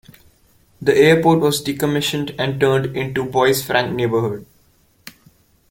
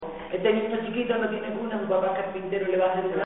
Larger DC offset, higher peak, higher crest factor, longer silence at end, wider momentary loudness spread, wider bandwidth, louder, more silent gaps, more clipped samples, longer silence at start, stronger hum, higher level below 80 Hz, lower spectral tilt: second, under 0.1% vs 0.2%; first, -2 dBFS vs -10 dBFS; about the same, 18 dB vs 16 dB; first, 0.6 s vs 0 s; first, 10 LU vs 6 LU; first, 17 kHz vs 4 kHz; first, -17 LUFS vs -27 LUFS; neither; neither; first, 0.8 s vs 0 s; neither; first, -52 dBFS vs -60 dBFS; about the same, -5 dB/octave vs -4 dB/octave